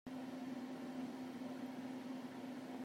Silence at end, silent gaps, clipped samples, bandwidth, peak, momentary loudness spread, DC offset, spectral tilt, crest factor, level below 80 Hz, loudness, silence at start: 0 s; none; under 0.1%; 16 kHz; -36 dBFS; 2 LU; under 0.1%; -5.5 dB/octave; 12 dB; -86 dBFS; -48 LUFS; 0.05 s